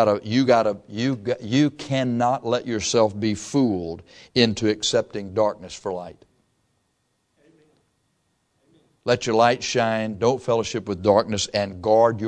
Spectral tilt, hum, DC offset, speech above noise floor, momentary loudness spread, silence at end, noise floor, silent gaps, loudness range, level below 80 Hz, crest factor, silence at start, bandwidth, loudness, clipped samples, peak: -5 dB/octave; none; under 0.1%; 49 dB; 10 LU; 0 s; -71 dBFS; none; 10 LU; -58 dBFS; 20 dB; 0 s; 10.5 kHz; -22 LUFS; under 0.1%; -2 dBFS